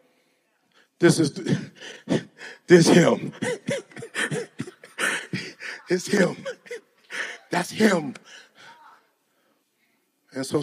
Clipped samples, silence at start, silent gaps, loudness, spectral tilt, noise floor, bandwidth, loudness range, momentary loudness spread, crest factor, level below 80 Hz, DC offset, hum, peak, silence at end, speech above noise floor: under 0.1%; 1 s; none; -23 LUFS; -5 dB/octave; -69 dBFS; 15.5 kHz; 7 LU; 21 LU; 22 dB; -70 dBFS; under 0.1%; none; -2 dBFS; 0 s; 49 dB